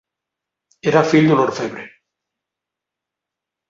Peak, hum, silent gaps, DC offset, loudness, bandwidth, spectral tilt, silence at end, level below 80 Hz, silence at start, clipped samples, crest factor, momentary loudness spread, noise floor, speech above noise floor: -2 dBFS; none; none; under 0.1%; -16 LUFS; 7.6 kHz; -6.5 dB/octave; 1.8 s; -62 dBFS; 0.85 s; under 0.1%; 18 dB; 14 LU; -84 dBFS; 69 dB